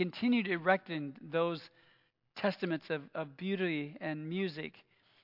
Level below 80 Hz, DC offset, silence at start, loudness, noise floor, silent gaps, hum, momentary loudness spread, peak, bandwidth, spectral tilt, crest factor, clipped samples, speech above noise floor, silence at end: -88 dBFS; under 0.1%; 0 s; -35 LUFS; -71 dBFS; none; none; 12 LU; -14 dBFS; 5.8 kHz; -8 dB/octave; 22 dB; under 0.1%; 36 dB; 0.45 s